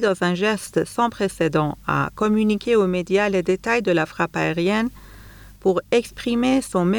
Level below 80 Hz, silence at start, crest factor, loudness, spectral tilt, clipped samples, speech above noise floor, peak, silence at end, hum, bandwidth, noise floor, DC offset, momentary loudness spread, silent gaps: -48 dBFS; 0 s; 14 dB; -21 LUFS; -6 dB/octave; under 0.1%; 22 dB; -6 dBFS; 0 s; none; over 20 kHz; -43 dBFS; under 0.1%; 4 LU; none